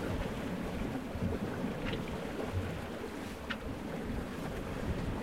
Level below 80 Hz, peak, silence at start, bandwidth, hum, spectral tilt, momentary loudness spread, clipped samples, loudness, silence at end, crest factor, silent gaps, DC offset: -46 dBFS; -22 dBFS; 0 s; 16 kHz; none; -6.5 dB/octave; 4 LU; under 0.1%; -39 LUFS; 0 s; 14 dB; none; 0.1%